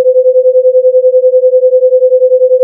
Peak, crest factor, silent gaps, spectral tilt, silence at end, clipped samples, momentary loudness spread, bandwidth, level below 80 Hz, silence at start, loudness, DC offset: 0 dBFS; 6 dB; none; -9.5 dB/octave; 0 s; under 0.1%; 0 LU; 0.6 kHz; -88 dBFS; 0 s; -7 LUFS; under 0.1%